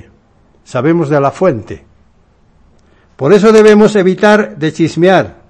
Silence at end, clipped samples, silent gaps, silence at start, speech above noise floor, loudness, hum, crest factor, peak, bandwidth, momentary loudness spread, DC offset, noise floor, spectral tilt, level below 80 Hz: 0.15 s; 2%; none; 0.7 s; 40 dB; -9 LUFS; none; 10 dB; 0 dBFS; 11 kHz; 14 LU; under 0.1%; -49 dBFS; -6.5 dB/octave; -46 dBFS